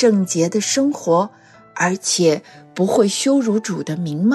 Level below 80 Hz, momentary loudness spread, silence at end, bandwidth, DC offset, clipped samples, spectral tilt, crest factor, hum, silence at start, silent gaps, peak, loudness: -66 dBFS; 8 LU; 0 s; 12.5 kHz; under 0.1%; under 0.1%; -4.5 dB/octave; 14 dB; none; 0 s; none; -4 dBFS; -18 LUFS